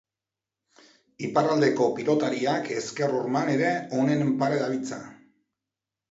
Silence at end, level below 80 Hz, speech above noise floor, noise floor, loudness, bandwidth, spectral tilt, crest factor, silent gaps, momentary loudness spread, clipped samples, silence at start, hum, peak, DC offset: 1 s; -72 dBFS; 65 dB; -89 dBFS; -25 LUFS; 8 kHz; -6 dB/octave; 20 dB; none; 9 LU; under 0.1%; 1.2 s; none; -8 dBFS; under 0.1%